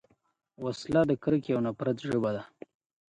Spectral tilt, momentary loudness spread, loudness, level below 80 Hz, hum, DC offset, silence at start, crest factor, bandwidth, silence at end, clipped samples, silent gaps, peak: -7.5 dB/octave; 12 LU; -30 LUFS; -62 dBFS; none; under 0.1%; 0.6 s; 20 dB; 11 kHz; 0.6 s; under 0.1%; none; -12 dBFS